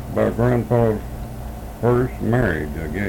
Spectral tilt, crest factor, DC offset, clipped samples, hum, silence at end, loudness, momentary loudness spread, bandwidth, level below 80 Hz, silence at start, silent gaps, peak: -8.5 dB/octave; 14 dB; under 0.1%; under 0.1%; none; 0 s; -20 LUFS; 14 LU; 18 kHz; -34 dBFS; 0 s; none; -6 dBFS